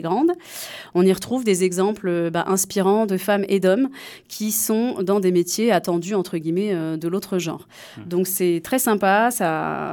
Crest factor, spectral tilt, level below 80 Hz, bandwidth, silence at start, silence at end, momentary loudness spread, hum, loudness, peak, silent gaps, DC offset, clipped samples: 16 dB; -4.5 dB/octave; -64 dBFS; 19 kHz; 0 s; 0 s; 9 LU; none; -21 LUFS; -6 dBFS; none; under 0.1%; under 0.1%